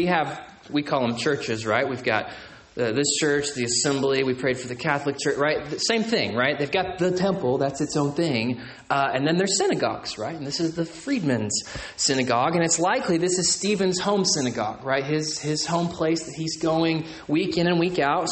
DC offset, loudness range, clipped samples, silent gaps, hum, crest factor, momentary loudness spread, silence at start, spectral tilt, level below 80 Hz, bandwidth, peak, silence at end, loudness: under 0.1%; 2 LU; under 0.1%; none; none; 18 dB; 7 LU; 0 s; -4 dB/octave; -56 dBFS; 8.8 kHz; -6 dBFS; 0 s; -24 LUFS